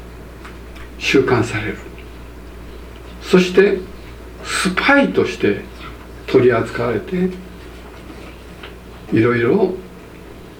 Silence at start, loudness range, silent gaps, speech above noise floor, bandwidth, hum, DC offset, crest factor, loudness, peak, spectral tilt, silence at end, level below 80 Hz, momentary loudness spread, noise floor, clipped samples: 0 s; 4 LU; none; 21 dB; 17 kHz; none; under 0.1%; 18 dB; -16 LUFS; 0 dBFS; -5.5 dB/octave; 0 s; -38 dBFS; 23 LU; -37 dBFS; under 0.1%